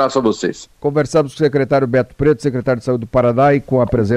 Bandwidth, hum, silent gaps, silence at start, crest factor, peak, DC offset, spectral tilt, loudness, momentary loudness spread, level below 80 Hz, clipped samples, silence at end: 11.5 kHz; none; none; 0 s; 12 dB; -4 dBFS; under 0.1%; -7 dB/octave; -16 LUFS; 6 LU; -40 dBFS; under 0.1%; 0 s